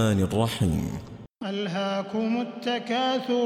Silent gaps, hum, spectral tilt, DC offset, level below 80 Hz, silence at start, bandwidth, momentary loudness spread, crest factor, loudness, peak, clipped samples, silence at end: none; none; -6 dB/octave; under 0.1%; -48 dBFS; 0 s; 16 kHz; 10 LU; 14 dB; -27 LUFS; -12 dBFS; under 0.1%; 0 s